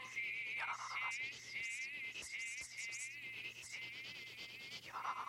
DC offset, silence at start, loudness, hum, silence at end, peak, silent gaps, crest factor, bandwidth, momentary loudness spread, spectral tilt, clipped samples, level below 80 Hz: under 0.1%; 0 s; -44 LUFS; none; 0 s; -30 dBFS; none; 16 dB; 16 kHz; 7 LU; 0.5 dB/octave; under 0.1%; -82 dBFS